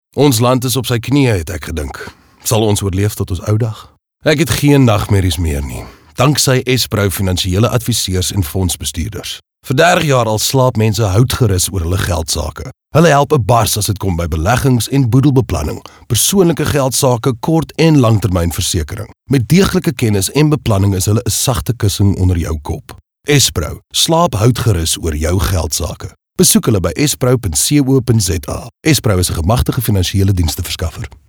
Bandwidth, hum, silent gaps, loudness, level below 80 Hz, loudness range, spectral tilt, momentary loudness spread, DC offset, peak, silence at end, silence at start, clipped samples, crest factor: over 20 kHz; none; none; -13 LUFS; -30 dBFS; 2 LU; -5 dB/octave; 11 LU; under 0.1%; 0 dBFS; 0.2 s; 0.15 s; under 0.1%; 14 dB